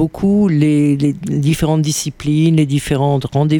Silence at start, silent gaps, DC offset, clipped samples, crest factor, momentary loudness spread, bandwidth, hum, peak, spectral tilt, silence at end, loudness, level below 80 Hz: 0 s; none; under 0.1%; under 0.1%; 12 dB; 5 LU; 18.5 kHz; none; -2 dBFS; -6.5 dB/octave; 0 s; -15 LUFS; -38 dBFS